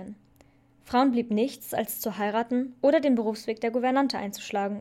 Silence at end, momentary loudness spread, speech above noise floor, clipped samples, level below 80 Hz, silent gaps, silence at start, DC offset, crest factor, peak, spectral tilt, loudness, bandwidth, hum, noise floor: 0 s; 8 LU; 33 dB; under 0.1%; -66 dBFS; none; 0 s; under 0.1%; 16 dB; -10 dBFS; -5 dB/octave; -27 LUFS; 16.5 kHz; none; -59 dBFS